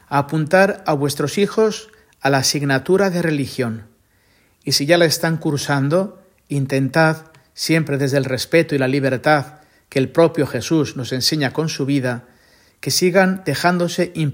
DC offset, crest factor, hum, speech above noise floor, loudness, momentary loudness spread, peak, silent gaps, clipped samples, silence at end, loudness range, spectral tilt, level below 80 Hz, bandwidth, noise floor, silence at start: under 0.1%; 18 dB; none; 40 dB; -18 LUFS; 9 LU; 0 dBFS; none; under 0.1%; 0 s; 2 LU; -5 dB/octave; -58 dBFS; 16.5 kHz; -57 dBFS; 0.1 s